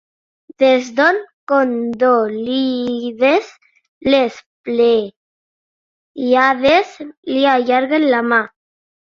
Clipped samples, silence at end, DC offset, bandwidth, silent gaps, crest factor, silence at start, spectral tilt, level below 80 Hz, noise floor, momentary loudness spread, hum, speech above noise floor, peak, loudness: under 0.1%; 0.7 s; under 0.1%; 7.4 kHz; 1.33-1.47 s, 3.88-4.01 s, 4.46-4.64 s, 5.16-6.15 s, 7.17-7.23 s; 16 dB; 0.6 s; -4.5 dB/octave; -56 dBFS; under -90 dBFS; 10 LU; none; over 75 dB; -2 dBFS; -15 LUFS